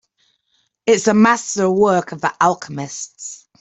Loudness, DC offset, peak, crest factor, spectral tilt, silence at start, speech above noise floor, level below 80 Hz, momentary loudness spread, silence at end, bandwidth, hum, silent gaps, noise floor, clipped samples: -17 LUFS; under 0.1%; -2 dBFS; 16 dB; -4.5 dB/octave; 0.85 s; 49 dB; -60 dBFS; 15 LU; 0.25 s; 8.4 kHz; none; none; -66 dBFS; under 0.1%